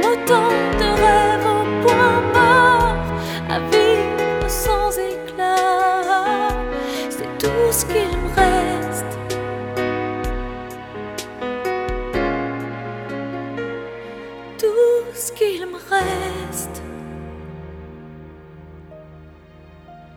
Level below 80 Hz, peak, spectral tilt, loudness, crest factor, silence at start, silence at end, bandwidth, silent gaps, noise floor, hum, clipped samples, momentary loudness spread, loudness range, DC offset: -34 dBFS; -2 dBFS; -4 dB/octave; -19 LUFS; 18 dB; 0 s; 0 s; 19 kHz; none; -44 dBFS; none; under 0.1%; 18 LU; 11 LU; under 0.1%